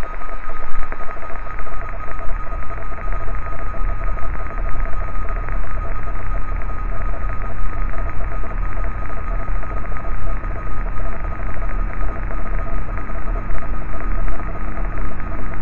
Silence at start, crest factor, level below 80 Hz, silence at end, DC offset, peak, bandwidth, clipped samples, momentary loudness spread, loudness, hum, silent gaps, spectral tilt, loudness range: 0 s; 12 dB; -22 dBFS; 0 s; 10%; -2 dBFS; 2.9 kHz; under 0.1%; 3 LU; -28 LUFS; none; none; -9 dB/octave; 1 LU